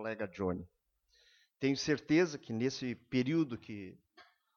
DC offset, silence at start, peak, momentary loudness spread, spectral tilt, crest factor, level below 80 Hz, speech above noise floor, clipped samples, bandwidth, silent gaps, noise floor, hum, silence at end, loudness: under 0.1%; 0 s; -18 dBFS; 14 LU; -5.5 dB/octave; 18 dB; -70 dBFS; 36 dB; under 0.1%; 7.2 kHz; none; -71 dBFS; none; 0.35 s; -35 LUFS